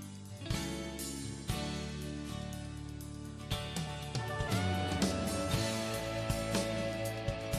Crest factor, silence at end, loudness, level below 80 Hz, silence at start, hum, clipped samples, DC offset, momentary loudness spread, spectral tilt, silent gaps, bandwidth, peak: 18 dB; 0 s; -37 LUFS; -50 dBFS; 0 s; none; under 0.1%; under 0.1%; 11 LU; -4.5 dB/octave; none; 14 kHz; -20 dBFS